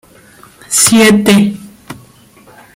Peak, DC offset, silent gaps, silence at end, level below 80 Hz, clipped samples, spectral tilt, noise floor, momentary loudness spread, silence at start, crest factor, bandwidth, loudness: 0 dBFS; under 0.1%; none; 0.85 s; -46 dBFS; under 0.1%; -3.5 dB/octave; -42 dBFS; 21 LU; 0.7 s; 12 dB; 16.5 kHz; -8 LUFS